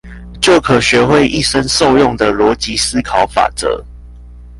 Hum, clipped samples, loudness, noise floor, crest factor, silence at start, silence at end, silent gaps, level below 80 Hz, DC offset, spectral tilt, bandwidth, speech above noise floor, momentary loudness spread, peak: 60 Hz at -30 dBFS; under 0.1%; -12 LUFS; -33 dBFS; 12 dB; 0.05 s; 0 s; none; -32 dBFS; under 0.1%; -4 dB/octave; 11.5 kHz; 22 dB; 5 LU; 0 dBFS